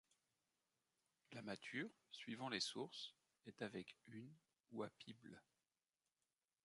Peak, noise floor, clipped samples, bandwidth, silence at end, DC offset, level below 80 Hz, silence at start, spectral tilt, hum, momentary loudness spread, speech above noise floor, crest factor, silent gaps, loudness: -28 dBFS; under -90 dBFS; under 0.1%; 11 kHz; 1.25 s; under 0.1%; under -90 dBFS; 1.3 s; -3.5 dB/octave; none; 19 LU; over 38 dB; 26 dB; 4.60-4.64 s; -52 LUFS